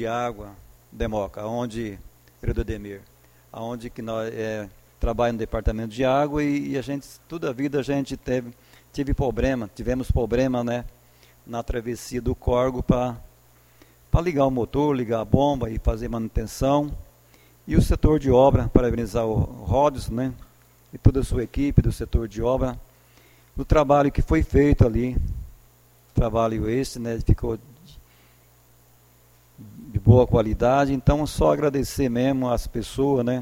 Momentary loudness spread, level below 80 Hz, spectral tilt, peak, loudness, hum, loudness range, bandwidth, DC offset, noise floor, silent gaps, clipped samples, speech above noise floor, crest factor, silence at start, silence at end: 14 LU; -32 dBFS; -7.5 dB/octave; 0 dBFS; -24 LUFS; none; 8 LU; 16.5 kHz; under 0.1%; -56 dBFS; none; under 0.1%; 33 dB; 22 dB; 0 s; 0 s